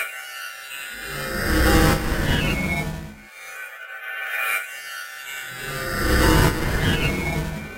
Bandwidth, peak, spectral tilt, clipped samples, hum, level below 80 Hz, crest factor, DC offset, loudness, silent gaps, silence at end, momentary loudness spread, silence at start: 16 kHz; -4 dBFS; -4.5 dB/octave; under 0.1%; none; -30 dBFS; 18 dB; under 0.1%; -23 LUFS; none; 0 s; 17 LU; 0 s